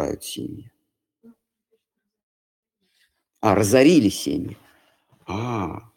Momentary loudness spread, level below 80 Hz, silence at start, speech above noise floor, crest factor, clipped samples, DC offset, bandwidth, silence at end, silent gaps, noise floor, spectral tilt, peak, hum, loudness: 20 LU; -54 dBFS; 0 s; 56 dB; 22 dB; under 0.1%; under 0.1%; 17.5 kHz; 0.15 s; 2.23-2.63 s; -76 dBFS; -5.5 dB/octave; -2 dBFS; none; -21 LUFS